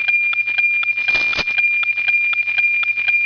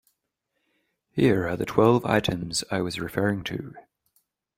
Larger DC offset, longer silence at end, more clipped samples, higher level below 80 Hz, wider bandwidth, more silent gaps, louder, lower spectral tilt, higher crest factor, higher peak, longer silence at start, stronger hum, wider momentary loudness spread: neither; second, 0 s vs 0.75 s; neither; about the same, -52 dBFS vs -54 dBFS; second, 5.4 kHz vs 16 kHz; neither; first, -14 LUFS vs -25 LUFS; second, -1 dB/octave vs -5.5 dB/octave; second, 10 dB vs 22 dB; second, -8 dBFS vs -4 dBFS; second, 0 s vs 1.15 s; neither; second, 1 LU vs 13 LU